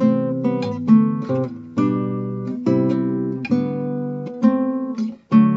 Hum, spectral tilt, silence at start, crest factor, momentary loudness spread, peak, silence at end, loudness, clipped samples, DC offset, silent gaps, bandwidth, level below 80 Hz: none; -9.5 dB/octave; 0 s; 16 dB; 10 LU; -2 dBFS; 0 s; -20 LUFS; under 0.1%; under 0.1%; none; 6.4 kHz; -68 dBFS